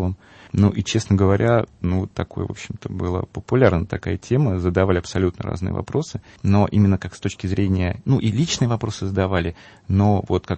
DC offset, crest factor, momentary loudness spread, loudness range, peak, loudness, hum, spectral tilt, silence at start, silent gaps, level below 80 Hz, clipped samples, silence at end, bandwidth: under 0.1%; 20 dB; 10 LU; 1 LU; 0 dBFS; -21 LUFS; none; -6.5 dB/octave; 0 s; none; -42 dBFS; under 0.1%; 0 s; 8.6 kHz